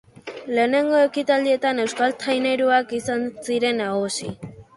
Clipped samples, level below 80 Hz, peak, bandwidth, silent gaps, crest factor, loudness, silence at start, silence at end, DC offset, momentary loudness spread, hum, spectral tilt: under 0.1%; -60 dBFS; -6 dBFS; 11.5 kHz; none; 16 dB; -21 LUFS; 0.25 s; 0.15 s; under 0.1%; 10 LU; none; -4 dB/octave